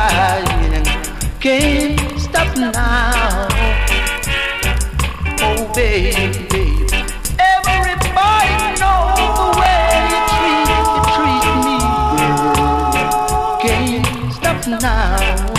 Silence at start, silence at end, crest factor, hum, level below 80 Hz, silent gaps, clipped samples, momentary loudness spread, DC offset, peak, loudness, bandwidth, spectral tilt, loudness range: 0 s; 0 s; 14 dB; none; -20 dBFS; none; under 0.1%; 5 LU; under 0.1%; 0 dBFS; -15 LUFS; 15.5 kHz; -4 dB/octave; 3 LU